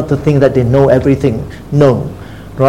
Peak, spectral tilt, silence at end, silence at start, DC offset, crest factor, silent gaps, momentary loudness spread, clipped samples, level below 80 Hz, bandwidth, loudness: 0 dBFS; -8.5 dB/octave; 0 s; 0 s; 0.8%; 12 dB; none; 15 LU; 0.4%; -32 dBFS; 10.5 kHz; -11 LUFS